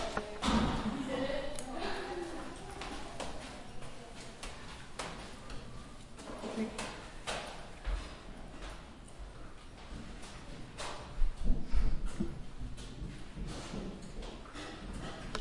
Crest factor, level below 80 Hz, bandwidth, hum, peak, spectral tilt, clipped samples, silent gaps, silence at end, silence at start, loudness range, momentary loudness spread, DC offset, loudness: 20 dB; -42 dBFS; 11.5 kHz; none; -16 dBFS; -5 dB/octave; under 0.1%; none; 0 s; 0 s; 7 LU; 13 LU; under 0.1%; -42 LUFS